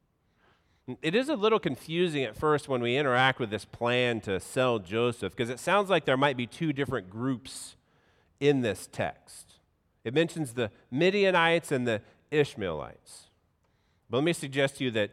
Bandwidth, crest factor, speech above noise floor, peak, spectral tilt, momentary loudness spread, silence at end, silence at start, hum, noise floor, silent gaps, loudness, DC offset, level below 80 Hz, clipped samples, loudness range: 15.5 kHz; 20 dB; 42 dB; -8 dBFS; -5 dB/octave; 11 LU; 0.05 s; 0.9 s; none; -70 dBFS; none; -28 LUFS; under 0.1%; -64 dBFS; under 0.1%; 5 LU